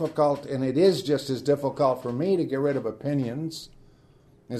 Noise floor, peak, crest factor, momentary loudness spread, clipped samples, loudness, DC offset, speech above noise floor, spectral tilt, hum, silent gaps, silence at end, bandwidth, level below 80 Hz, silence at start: -57 dBFS; -8 dBFS; 18 dB; 9 LU; under 0.1%; -25 LUFS; under 0.1%; 32 dB; -6.5 dB/octave; none; none; 0 s; 13.5 kHz; -62 dBFS; 0 s